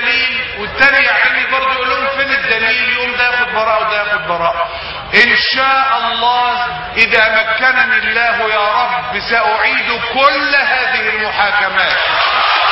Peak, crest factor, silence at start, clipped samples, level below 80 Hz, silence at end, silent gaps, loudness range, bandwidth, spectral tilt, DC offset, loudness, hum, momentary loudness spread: 0 dBFS; 14 dB; 0 s; under 0.1%; -42 dBFS; 0 s; none; 2 LU; 8 kHz; -4 dB/octave; under 0.1%; -12 LUFS; none; 6 LU